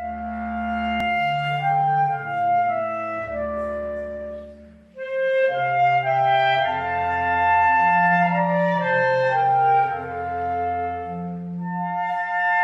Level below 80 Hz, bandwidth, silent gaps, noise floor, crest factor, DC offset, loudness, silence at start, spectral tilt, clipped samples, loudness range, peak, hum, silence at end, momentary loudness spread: -50 dBFS; 7.6 kHz; none; -44 dBFS; 12 dB; under 0.1%; -21 LUFS; 0 s; -7 dB/octave; under 0.1%; 6 LU; -8 dBFS; none; 0 s; 12 LU